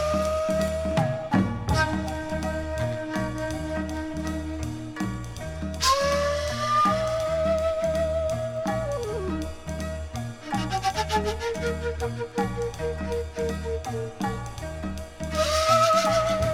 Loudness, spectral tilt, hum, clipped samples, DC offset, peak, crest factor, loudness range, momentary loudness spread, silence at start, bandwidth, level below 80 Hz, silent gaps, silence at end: -27 LUFS; -5 dB/octave; none; under 0.1%; under 0.1%; -10 dBFS; 18 dB; 6 LU; 11 LU; 0 s; 18 kHz; -38 dBFS; none; 0 s